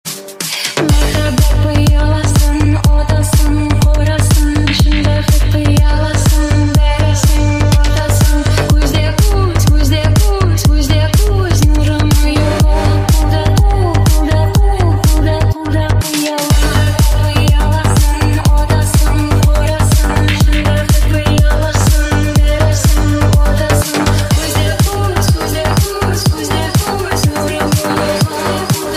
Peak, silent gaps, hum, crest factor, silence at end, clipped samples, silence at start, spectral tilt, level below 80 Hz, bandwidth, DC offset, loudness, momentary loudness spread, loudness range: 0 dBFS; none; none; 10 dB; 0 s; under 0.1%; 0.05 s; -5.5 dB/octave; -14 dBFS; 16 kHz; under 0.1%; -12 LUFS; 3 LU; 1 LU